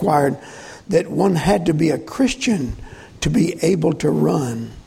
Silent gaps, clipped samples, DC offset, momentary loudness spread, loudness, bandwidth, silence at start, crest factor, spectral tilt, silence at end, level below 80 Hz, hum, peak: none; under 0.1%; under 0.1%; 11 LU; -19 LUFS; 16 kHz; 0 s; 16 dB; -6 dB/octave; 0.05 s; -40 dBFS; none; -2 dBFS